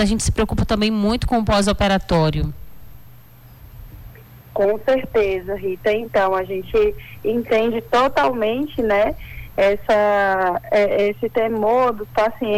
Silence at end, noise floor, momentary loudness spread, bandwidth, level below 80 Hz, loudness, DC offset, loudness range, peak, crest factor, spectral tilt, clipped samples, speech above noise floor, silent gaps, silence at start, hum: 0 s; -44 dBFS; 6 LU; 19 kHz; -34 dBFS; -19 LUFS; under 0.1%; 5 LU; -10 dBFS; 10 dB; -5.5 dB/octave; under 0.1%; 26 dB; none; 0 s; none